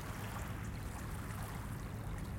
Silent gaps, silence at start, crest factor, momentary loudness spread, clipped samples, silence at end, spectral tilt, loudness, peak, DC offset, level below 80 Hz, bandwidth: none; 0 s; 14 dB; 1 LU; under 0.1%; 0 s; -5.5 dB/octave; -44 LUFS; -28 dBFS; under 0.1%; -48 dBFS; 17 kHz